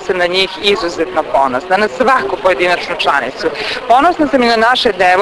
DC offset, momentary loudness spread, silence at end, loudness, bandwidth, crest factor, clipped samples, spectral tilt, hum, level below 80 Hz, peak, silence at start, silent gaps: under 0.1%; 6 LU; 0 s; -12 LUFS; 11 kHz; 12 dB; 0.1%; -3.5 dB/octave; none; -44 dBFS; 0 dBFS; 0 s; none